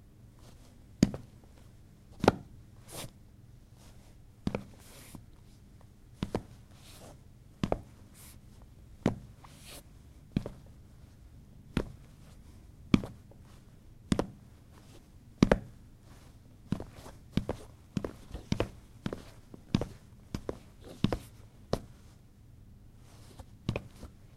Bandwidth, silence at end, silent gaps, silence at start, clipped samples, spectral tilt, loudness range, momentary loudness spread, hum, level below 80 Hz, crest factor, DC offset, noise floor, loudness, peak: 15.5 kHz; 0 s; none; 0.25 s; under 0.1%; -6.5 dB/octave; 8 LU; 26 LU; none; -50 dBFS; 34 dB; under 0.1%; -56 dBFS; -36 LUFS; -4 dBFS